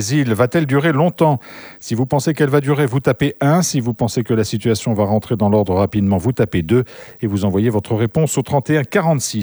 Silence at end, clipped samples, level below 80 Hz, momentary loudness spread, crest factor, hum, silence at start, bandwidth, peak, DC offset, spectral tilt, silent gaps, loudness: 0 s; under 0.1%; -46 dBFS; 4 LU; 16 dB; none; 0 s; over 20 kHz; 0 dBFS; under 0.1%; -6 dB/octave; none; -17 LUFS